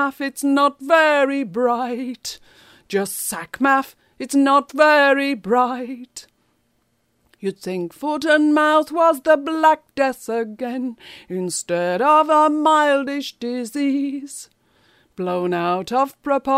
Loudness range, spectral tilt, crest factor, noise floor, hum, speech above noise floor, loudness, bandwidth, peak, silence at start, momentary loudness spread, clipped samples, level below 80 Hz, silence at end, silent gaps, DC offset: 5 LU; -4 dB/octave; 18 dB; -66 dBFS; none; 48 dB; -19 LUFS; 16 kHz; -2 dBFS; 0 s; 15 LU; under 0.1%; -66 dBFS; 0 s; none; under 0.1%